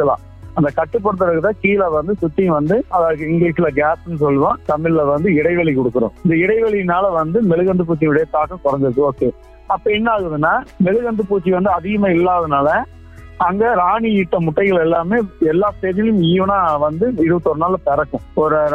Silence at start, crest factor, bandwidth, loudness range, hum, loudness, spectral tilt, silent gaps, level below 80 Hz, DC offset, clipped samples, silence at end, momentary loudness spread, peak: 0 s; 14 dB; 5 kHz; 1 LU; none; -16 LUFS; -9 dB/octave; none; -40 dBFS; under 0.1%; under 0.1%; 0 s; 4 LU; 0 dBFS